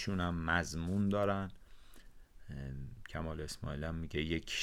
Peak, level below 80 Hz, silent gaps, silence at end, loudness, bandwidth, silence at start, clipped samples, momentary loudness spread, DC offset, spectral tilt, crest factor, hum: -16 dBFS; -50 dBFS; none; 0 s; -38 LUFS; 15 kHz; 0 s; under 0.1%; 13 LU; under 0.1%; -5.5 dB/octave; 22 dB; none